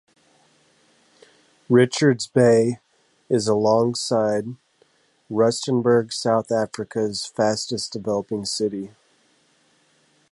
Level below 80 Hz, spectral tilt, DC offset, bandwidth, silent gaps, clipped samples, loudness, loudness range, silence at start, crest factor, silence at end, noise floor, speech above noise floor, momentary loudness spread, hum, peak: -64 dBFS; -5 dB/octave; under 0.1%; 11.5 kHz; none; under 0.1%; -21 LUFS; 6 LU; 1.7 s; 18 dB; 1.45 s; -62 dBFS; 41 dB; 10 LU; none; -4 dBFS